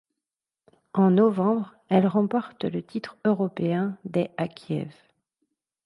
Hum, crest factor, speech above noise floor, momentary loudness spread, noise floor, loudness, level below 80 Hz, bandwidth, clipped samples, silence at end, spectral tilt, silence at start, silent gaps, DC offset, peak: none; 18 dB; 64 dB; 12 LU; -89 dBFS; -25 LUFS; -70 dBFS; 5.6 kHz; under 0.1%; 0.95 s; -9.5 dB/octave; 0.95 s; none; under 0.1%; -6 dBFS